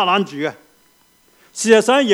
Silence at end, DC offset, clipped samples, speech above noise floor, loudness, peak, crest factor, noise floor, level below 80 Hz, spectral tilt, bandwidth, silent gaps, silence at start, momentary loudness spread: 0 s; under 0.1%; under 0.1%; 40 dB; -16 LUFS; 0 dBFS; 18 dB; -55 dBFS; -68 dBFS; -3.5 dB/octave; 14 kHz; none; 0 s; 14 LU